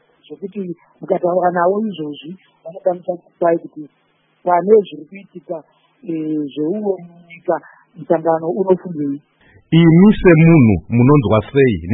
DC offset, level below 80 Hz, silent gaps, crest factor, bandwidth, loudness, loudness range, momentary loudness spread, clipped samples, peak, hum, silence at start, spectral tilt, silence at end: under 0.1%; -42 dBFS; none; 16 dB; 4 kHz; -15 LUFS; 9 LU; 23 LU; under 0.1%; 0 dBFS; none; 0.3 s; -12 dB/octave; 0 s